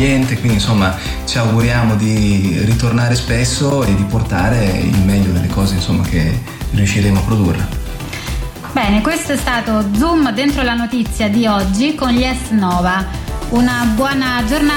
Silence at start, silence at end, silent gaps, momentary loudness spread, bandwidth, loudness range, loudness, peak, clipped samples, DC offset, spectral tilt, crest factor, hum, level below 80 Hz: 0 s; 0 s; none; 6 LU; 18.5 kHz; 2 LU; -15 LUFS; -2 dBFS; under 0.1%; under 0.1%; -5.5 dB/octave; 12 dB; none; -26 dBFS